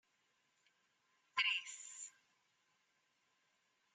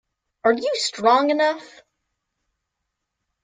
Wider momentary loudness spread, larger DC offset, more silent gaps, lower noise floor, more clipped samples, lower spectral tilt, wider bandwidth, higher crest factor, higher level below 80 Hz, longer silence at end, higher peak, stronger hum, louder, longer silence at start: first, 16 LU vs 6 LU; neither; neither; about the same, -81 dBFS vs -80 dBFS; neither; second, 4 dB/octave vs -2.5 dB/octave; first, 11.5 kHz vs 9.4 kHz; first, 28 dB vs 20 dB; second, under -90 dBFS vs -72 dBFS; about the same, 1.85 s vs 1.75 s; second, -22 dBFS vs -4 dBFS; neither; second, -39 LUFS vs -20 LUFS; first, 1.35 s vs 0.45 s